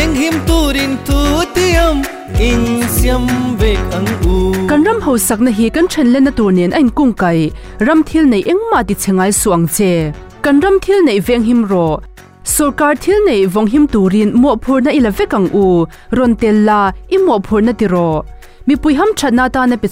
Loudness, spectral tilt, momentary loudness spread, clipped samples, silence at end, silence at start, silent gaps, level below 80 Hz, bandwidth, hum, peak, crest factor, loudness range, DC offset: -12 LUFS; -5.5 dB/octave; 5 LU; under 0.1%; 0 s; 0 s; none; -24 dBFS; 16 kHz; none; -2 dBFS; 10 dB; 2 LU; 0.4%